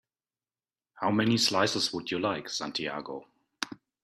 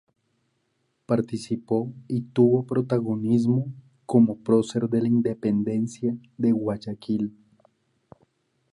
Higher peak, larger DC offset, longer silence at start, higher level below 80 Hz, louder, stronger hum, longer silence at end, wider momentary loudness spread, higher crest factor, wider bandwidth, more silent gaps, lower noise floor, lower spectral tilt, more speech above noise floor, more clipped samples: about the same, -10 dBFS vs -8 dBFS; neither; second, 0.95 s vs 1.1 s; about the same, -68 dBFS vs -64 dBFS; second, -29 LUFS vs -24 LUFS; neither; second, 0.3 s vs 1.45 s; first, 14 LU vs 9 LU; about the same, 22 dB vs 18 dB; first, 14 kHz vs 11 kHz; neither; first, under -90 dBFS vs -73 dBFS; second, -3.5 dB/octave vs -8.5 dB/octave; first, over 61 dB vs 49 dB; neither